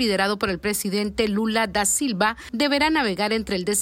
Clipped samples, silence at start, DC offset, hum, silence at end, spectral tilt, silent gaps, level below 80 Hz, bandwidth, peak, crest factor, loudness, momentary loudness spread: under 0.1%; 0 s; under 0.1%; none; 0 s; -3 dB/octave; none; -48 dBFS; 16.5 kHz; -8 dBFS; 14 dB; -22 LUFS; 4 LU